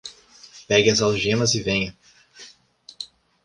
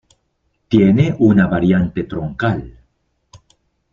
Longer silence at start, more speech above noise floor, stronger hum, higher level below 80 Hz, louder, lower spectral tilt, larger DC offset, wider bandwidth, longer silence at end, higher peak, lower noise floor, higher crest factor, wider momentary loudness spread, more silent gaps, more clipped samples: second, 0.05 s vs 0.7 s; second, 31 dB vs 53 dB; neither; second, -52 dBFS vs -42 dBFS; second, -20 LUFS vs -15 LUFS; second, -3.5 dB/octave vs -9 dB/octave; neither; first, 11 kHz vs 7 kHz; second, 0.4 s vs 1.2 s; about the same, -4 dBFS vs -2 dBFS; second, -51 dBFS vs -67 dBFS; about the same, 20 dB vs 16 dB; first, 20 LU vs 11 LU; neither; neither